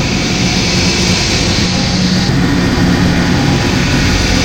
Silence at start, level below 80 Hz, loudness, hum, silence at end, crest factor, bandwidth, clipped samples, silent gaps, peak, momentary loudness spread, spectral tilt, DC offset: 0 s; -22 dBFS; -11 LUFS; none; 0 s; 12 dB; 17 kHz; under 0.1%; none; 0 dBFS; 1 LU; -4.5 dB/octave; 0.8%